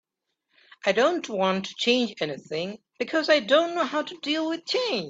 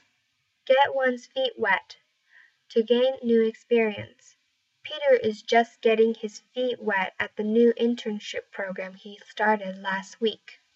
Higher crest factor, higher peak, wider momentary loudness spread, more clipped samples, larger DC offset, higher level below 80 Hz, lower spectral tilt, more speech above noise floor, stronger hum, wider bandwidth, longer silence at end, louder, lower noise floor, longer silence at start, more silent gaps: about the same, 20 dB vs 18 dB; about the same, -6 dBFS vs -8 dBFS; second, 10 LU vs 13 LU; neither; neither; about the same, -74 dBFS vs -78 dBFS; about the same, -4 dB/octave vs -5 dB/octave; first, 54 dB vs 48 dB; neither; about the same, 8 kHz vs 7.8 kHz; second, 0 s vs 0.25 s; about the same, -25 LUFS vs -25 LUFS; first, -79 dBFS vs -73 dBFS; first, 0.85 s vs 0.7 s; neither